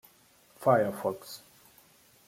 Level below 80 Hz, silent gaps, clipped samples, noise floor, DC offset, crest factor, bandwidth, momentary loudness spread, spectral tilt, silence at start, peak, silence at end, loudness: -74 dBFS; none; under 0.1%; -62 dBFS; under 0.1%; 22 dB; 16.5 kHz; 20 LU; -6 dB/octave; 0.6 s; -10 dBFS; 0.9 s; -28 LUFS